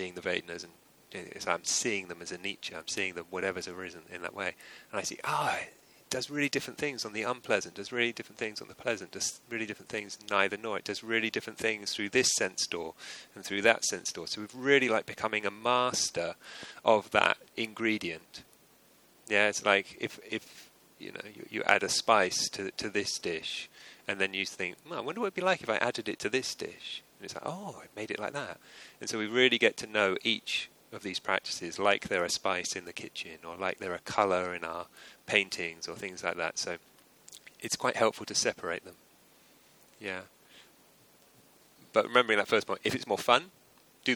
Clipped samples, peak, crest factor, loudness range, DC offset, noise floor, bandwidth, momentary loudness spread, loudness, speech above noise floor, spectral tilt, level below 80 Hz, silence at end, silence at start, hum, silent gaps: under 0.1%; -6 dBFS; 28 dB; 5 LU; under 0.1%; -62 dBFS; over 20 kHz; 17 LU; -31 LUFS; 30 dB; -2 dB/octave; -72 dBFS; 0 s; 0 s; none; none